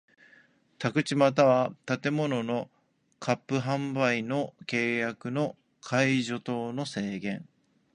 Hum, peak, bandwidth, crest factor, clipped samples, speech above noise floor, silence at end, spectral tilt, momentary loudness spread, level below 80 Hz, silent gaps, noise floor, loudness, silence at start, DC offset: none; -8 dBFS; 10.5 kHz; 22 dB; under 0.1%; 33 dB; 0.5 s; -6 dB/octave; 11 LU; -72 dBFS; none; -61 dBFS; -29 LUFS; 0.8 s; under 0.1%